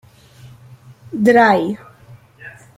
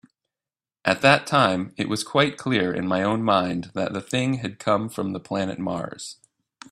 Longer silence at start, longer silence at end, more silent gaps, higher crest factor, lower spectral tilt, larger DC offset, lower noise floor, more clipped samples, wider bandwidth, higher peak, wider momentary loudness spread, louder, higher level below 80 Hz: second, 0.45 s vs 0.85 s; second, 0.3 s vs 0.6 s; neither; second, 18 dB vs 24 dB; first, -6.5 dB/octave vs -5 dB/octave; neither; second, -44 dBFS vs under -90 dBFS; neither; first, 15.5 kHz vs 14 kHz; about the same, -2 dBFS vs 0 dBFS; first, 27 LU vs 11 LU; first, -14 LUFS vs -23 LUFS; about the same, -60 dBFS vs -60 dBFS